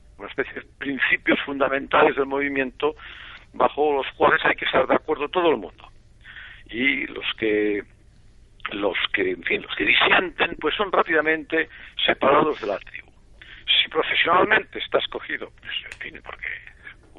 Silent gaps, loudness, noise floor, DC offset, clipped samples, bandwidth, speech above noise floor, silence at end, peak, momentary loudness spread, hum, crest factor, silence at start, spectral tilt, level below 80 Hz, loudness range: none; -22 LUFS; -50 dBFS; under 0.1%; under 0.1%; 7.6 kHz; 28 dB; 0.25 s; -4 dBFS; 17 LU; none; 20 dB; 0.2 s; -5.5 dB/octave; -52 dBFS; 4 LU